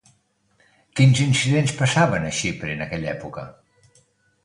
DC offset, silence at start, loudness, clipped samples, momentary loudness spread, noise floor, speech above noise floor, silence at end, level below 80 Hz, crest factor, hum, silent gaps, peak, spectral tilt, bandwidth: under 0.1%; 0.95 s; -21 LUFS; under 0.1%; 16 LU; -64 dBFS; 44 dB; 0.95 s; -50 dBFS; 18 dB; none; none; -4 dBFS; -5 dB/octave; 11 kHz